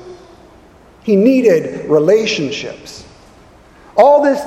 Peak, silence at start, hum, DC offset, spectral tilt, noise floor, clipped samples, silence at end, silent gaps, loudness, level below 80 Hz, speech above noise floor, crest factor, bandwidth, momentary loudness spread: 0 dBFS; 0 s; none; under 0.1%; -5.5 dB/octave; -43 dBFS; under 0.1%; 0 s; none; -13 LUFS; -52 dBFS; 31 dB; 14 dB; 13.5 kHz; 18 LU